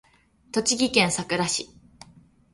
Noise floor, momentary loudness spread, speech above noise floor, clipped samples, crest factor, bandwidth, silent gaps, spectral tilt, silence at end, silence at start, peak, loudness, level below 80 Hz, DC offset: -55 dBFS; 9 LU; 31 dB; under 0.1%; 22 dB; 11.5 kHz; none; -2.5 dB/octave; 0.85 s; 0.55 s; -4 dBFS; -23 LUFS; -58 dBFS; under 0.1%